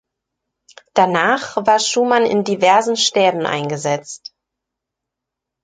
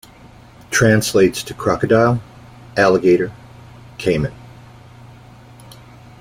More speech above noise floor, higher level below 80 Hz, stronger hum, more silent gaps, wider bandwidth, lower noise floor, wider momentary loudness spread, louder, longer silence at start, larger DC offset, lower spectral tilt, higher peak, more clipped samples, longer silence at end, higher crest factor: first, 66 dB vs 28 dB; second, -66 dBFS vs -46 dBFS; neither; neither; second, 9.6 kHz vs 16.5 kHz; first, -82 dBFS vs -43 dBFS; second, 8 LU vs 11 LU; about the same, -16 LUFS vs -16 LUFS; first, 0.95 s vs 0.7 s; neither; second, -3 dB/octave vs -5.5 dB/octave; about the same, -2 dBFS vs -2 dBFS; neither; second, 1.45 s vs 1.8 s; about the same, 16 dB vs 18 dB